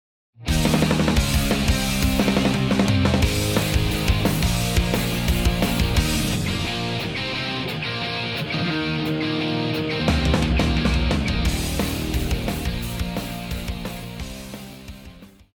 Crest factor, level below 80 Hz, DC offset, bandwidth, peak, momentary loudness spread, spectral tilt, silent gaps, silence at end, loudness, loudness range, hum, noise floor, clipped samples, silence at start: 16 dB; -28 dBFS; under 0.1%; over 20 kHz; -6 dBFS; 10 LU; -5 dB/octave; none; 0.3 s; -22 LUFS; 6 LU; none; -44 dBFS; under 0.1%; 0.4 s